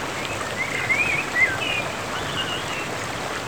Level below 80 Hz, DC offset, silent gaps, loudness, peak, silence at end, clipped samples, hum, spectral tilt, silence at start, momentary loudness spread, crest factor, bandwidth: -50 dBFS; 0.4%; none; -23 LUFS; -8 dBFS; 0 s; under 0.1%; none; -2.5 dB/octave; 0 s; 8 LU; 18 dB; over 20 kHz